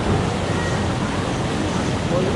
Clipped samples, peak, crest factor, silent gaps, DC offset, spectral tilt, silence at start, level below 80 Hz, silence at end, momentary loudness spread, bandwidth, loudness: under 0.1%; -8 dBFS; 12 dB; none; under 0.1%; -5.5 dB/octave; 0 s; -36 dBFS; 0 s; 2 LU; 11.5 kHz; -22 LUFS